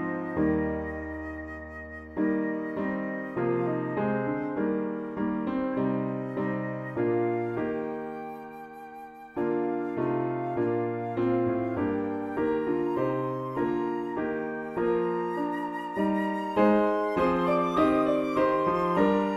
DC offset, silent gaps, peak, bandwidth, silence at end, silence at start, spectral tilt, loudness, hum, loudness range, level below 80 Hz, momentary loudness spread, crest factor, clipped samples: under 0.1%; none; -10 dBFS; 12 kHz; 0 s; 0 s; -8.5 dB/octave; -28 LUFS; none; 6 LU; -54 dBFS; 12 LU; 18 dB; under 0.1%